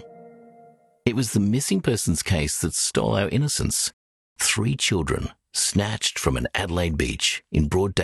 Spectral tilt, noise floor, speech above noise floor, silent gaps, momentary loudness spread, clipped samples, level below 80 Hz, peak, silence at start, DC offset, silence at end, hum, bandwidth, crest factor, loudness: -4 dB/octave; -53 dBFS; 30 dB; 3.93-4.36 s; 4 LU; under 0.1%; -38 dBFS; -4 dBFS; 0 s; under 0.1%; 0 s; none; 13 kHz; 20 dB; -23 LUFS